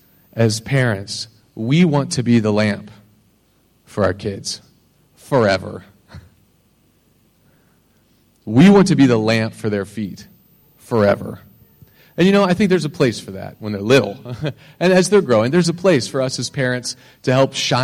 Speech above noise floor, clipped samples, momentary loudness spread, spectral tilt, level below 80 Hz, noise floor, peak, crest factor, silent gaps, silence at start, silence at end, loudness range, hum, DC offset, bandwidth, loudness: 42 dB; under 0.1%; 16 LU; -5.5 dB/octave; -52 dBFS; -58 dBFS; -2 dBFS; 16 dB; none; 0.35 s; 0 s; 7 LU; none; under 0.1%; 15.5 kHz; -17 LUFS